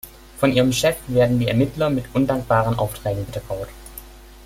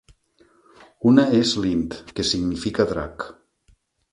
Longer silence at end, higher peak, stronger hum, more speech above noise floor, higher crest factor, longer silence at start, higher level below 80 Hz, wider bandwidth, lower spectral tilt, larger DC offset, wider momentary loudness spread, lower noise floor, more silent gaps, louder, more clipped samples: second, 0 s vs 0.8 s; about the same, -2 dBFS vs -2 dBFS; neither; second, 21 dB vs 40 dB; about the same, 18 dB vs 20 dB; second, 0.05 s vs 1 s; about the same, -42 dBFS vs -46 dBFS; first, 16.5 kHz vs 11.5 kHz; about the same, -6 dB/octave vs -5 dB/octave; neither; about the same, 17 LU vs 15 LU; second, -40 dBFS vs -61 dBFS; neither; about the same, -21 LUFS vs -21 LUFS; neither